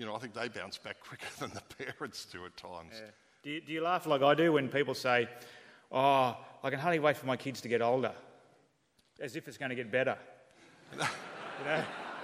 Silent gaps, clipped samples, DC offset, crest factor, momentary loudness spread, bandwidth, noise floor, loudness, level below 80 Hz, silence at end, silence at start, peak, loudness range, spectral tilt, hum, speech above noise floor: none; under 0.1%; under 0.1%; 22 dB; 19 LU; 15.5 kHz; -72 dBFS; -33 LUFS; -78 dBFS; 0 s; 0 s; -12 dBFS; 11 LU; -5 dB/octave; none; 39 dB